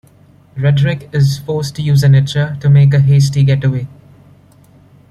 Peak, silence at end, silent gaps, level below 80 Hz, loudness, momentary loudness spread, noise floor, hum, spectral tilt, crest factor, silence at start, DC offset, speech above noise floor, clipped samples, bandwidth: -2 dBFS; 1.25 s; none; -44 dBFS; -12 LUFS; 10 LU; -45 dBFS; none; -7 dB/octave; 10 dB; 0.55 s; under 0.1%; 34 dB; under 0.1%; 12 kHz